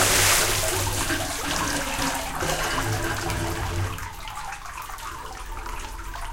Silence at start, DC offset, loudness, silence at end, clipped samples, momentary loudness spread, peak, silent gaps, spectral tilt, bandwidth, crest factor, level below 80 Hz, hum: 0 s; under 0.1%; -25 LUFS; 0 s; under 0.1%; 16 LU; -6 dBFS; none; -2.5 dB/octave; 17 kHz; 20 dB; -36 dBFS; none